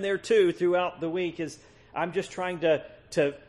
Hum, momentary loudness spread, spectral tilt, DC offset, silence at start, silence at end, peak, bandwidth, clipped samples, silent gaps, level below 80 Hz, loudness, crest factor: none; 10 LU; -5.5 dB/octave; under 0.1%; 0 s; 0.1 s; -12 dBFS; 11.5 kHz; under 0.1%; none; -64 dBFS; -28 LUFS; 16 dB